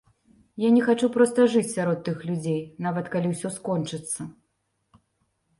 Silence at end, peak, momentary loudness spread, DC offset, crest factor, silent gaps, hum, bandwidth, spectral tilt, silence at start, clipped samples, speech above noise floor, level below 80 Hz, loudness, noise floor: 1.3 s; -8 dBFS; 11 LU; under 0.1%; 18 dB; none; none; 11.5 kHz; -6 dB/octave; 0.55 s; under 0.1%; 51 dB; -66 dBFS; -25 LUFS; -74 dBFS